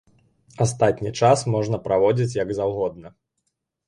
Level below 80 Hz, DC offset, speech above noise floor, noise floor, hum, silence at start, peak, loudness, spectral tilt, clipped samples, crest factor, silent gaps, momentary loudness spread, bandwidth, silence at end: -54 dBFS; under 0.1%; 55 dB; -76 dBFS; none; 0.6 s; -4 dBFS; -22 LUFS; -6 dB/octave; under 0.1%; 18 dB; none; 6 LU; 11.5 kHz; 0.8 s